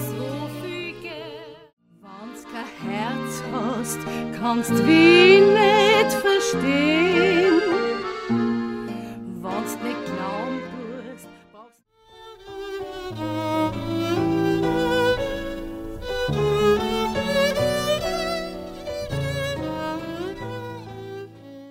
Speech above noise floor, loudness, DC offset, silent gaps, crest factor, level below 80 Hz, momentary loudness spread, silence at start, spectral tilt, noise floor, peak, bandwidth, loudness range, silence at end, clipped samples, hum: 38 dB; -21 LUFS; under 0.1%; 1.73-1.77 s; 20 dB; -46 dBFS; 19 LU; 0 s; -5 dB/octave; -54 dBFS; -2 dBFS; 16 kHz; 15 LU; 0 s; under 0.1%; none